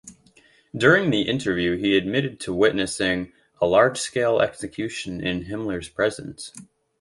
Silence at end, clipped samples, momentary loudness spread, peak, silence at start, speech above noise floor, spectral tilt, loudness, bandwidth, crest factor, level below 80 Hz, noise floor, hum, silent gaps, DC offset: 0.35 s; under 0.1%; 12 LU; -2 dBFS; 0.05 s; 34 dB; -4.5 dB/octave; -22 LUFS; 11.5 kHz; 22 dB; -52 dBFS; -57 dBFS; none; none; under 0.1%